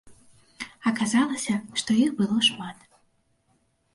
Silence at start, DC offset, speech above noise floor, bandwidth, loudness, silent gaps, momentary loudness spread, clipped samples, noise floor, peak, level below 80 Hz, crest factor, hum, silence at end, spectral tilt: 0.05 s; under 0.1%; 44 dB; 11.5 kHz; -24 LUFS; none; 17 LU; under 0.1%; -68 dBFS; -8 dBFS; -66 dBFS; 18 dB; none; 1.2 s; -3.5 dB/octave